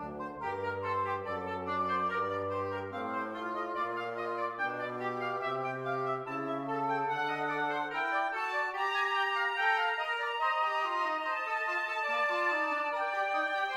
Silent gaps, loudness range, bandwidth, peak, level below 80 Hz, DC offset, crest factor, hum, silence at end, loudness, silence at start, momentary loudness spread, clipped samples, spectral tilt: none; 4 LU; 16 kHz; -18 dBFS; -72 dBFS; under 0.1%; 16 dB; none; 0 s; -33 LUFS; 0 s; 6 LU; under 0.1%; -4.5 dB/octave